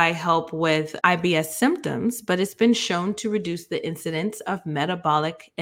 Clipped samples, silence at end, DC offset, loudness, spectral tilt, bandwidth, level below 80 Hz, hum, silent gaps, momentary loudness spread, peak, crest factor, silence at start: under 0.1%; 0 s; under 0.1%; -23 LUFS; -4.5 dB/octave; 17 kHz; -64 dBFS; none; none; 8 LU; -2 dBFS; 22 dB; 0 s